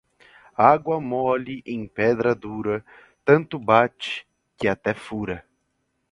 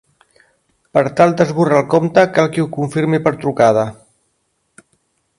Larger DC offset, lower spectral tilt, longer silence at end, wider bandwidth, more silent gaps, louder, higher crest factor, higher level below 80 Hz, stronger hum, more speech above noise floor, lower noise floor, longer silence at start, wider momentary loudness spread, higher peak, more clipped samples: neither; about the same, -7 dB/octave vs -7 dB/octave; second, 0.7 s vs 1.45 s; about the same, 11 kHz vs 11.5 kHz; neither; second, -23 LUFS vs -15 LUFS; first, 22 dB vs 16 dB; about the same, -56 dBFS vs -56 dBFS; neither; about the same, 51 dB vs 52 dB; first, -73 dBFS vs -66 dBFS; second, 0.6 s vs 0.95 s; first, 13 LU vs 6 LU; about the same, 0 dBFS vs 0 dBFS; neither